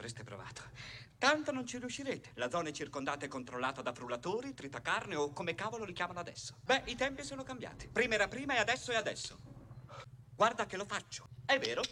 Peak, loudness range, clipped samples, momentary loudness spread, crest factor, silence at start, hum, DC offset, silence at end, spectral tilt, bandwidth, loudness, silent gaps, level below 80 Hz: -16 dBFS; 4 LU; under 0.1%; 16 LU; 22 dB; 0 s; none; under 0.1%; 0 s; -3 dB/octave; 15.5 kHz; -37 LUFS; none; -64 dBFS